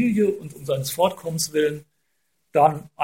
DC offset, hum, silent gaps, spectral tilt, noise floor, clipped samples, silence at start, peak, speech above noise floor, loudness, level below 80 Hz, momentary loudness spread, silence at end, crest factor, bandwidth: under 0.1%; none; none; -5 dB/octave; -73 dBFS; under 0.1%; 0 s; -4 dBFS; 51 dB; -23 LUFS; -62 dBFS; 8 LU; 0 s; 20 dB; 17 kHz